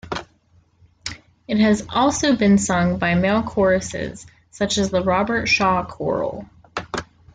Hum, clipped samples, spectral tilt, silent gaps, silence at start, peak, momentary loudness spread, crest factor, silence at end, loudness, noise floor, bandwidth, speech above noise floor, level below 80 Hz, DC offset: none; under 0.1%; -5 dB/octave; none; 0.05 s; -6 dBFS; 16 LU; 16 dB; 0.3 s; -19 LUFS; -57 dBFS; 9.4 kHz; 38 dB; -46 dBFS; under 0.1%